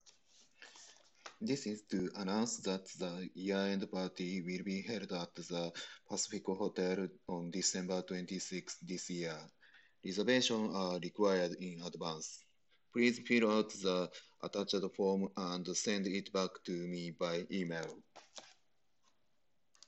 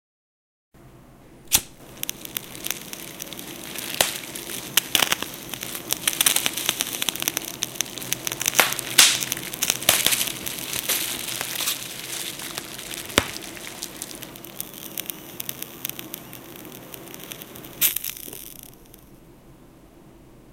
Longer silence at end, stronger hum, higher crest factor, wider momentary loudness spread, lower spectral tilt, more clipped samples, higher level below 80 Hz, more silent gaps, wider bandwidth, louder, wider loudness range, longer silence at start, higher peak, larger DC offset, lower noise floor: first, 1.4 s vs 0 s; neither; second, 22 dB vs 28 dB; second, 14 LU vs 18 LU; first, -4 dB/octave vs 0 dB/octave; neither; second, -80 dBFS vs -54 dBFS; neither; second, 8.4 kHz vs 17 kHz; second, -38 LUFS vs -23 LUFS; second, 5 LU vs 10 LU; second, 0.05 s vs 0.75 s; second, -18 dBFS vs 0 dBFS; neither; first, -84 dBFS vs -49 dBFS